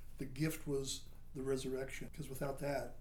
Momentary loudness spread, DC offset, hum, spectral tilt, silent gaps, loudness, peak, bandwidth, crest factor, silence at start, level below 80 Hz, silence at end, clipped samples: 8 LU; under 0.1%; none; -5 dB/octave; none; -42 LUFS; -24 dBFS; 19.5 kHz; 16 dB; 0 s; -52 dBFS; 0 s; under 0.1%